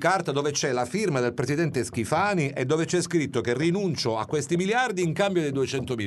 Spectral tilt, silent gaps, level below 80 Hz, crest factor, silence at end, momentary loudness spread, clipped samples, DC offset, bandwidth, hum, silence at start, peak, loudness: -5 dB/octave; none; -60 dBFS; 16 dB; 0 s; 3 LU; under 0.1%; under 0.1%; 12 kHz; none; 0 s; -10 dBFS; -25 LUFS